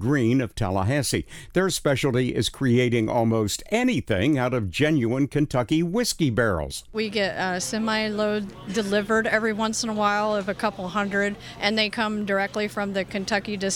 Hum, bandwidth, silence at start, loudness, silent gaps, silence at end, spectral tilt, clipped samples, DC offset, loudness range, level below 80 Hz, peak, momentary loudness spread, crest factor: none; 19 kHz; 0 s; -24 LUFS; none; 0 s; -5 dB/octave; under 0.1%; under 0.1%; 2 LU; -46 dBFS; -4 dBFS; 5 LU; 20 dB